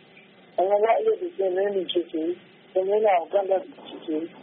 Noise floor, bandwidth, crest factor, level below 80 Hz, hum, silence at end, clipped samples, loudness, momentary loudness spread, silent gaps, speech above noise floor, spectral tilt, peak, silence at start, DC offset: -52 dBFS; 4 kHz; 16 dB; -78 dBFS; none; 0 s; under 0.1%; -25 LUFS; 11 LU; none; 28 dB; -2.5 dB/octave; -8 dBFS; 0.6 s; under 0.1%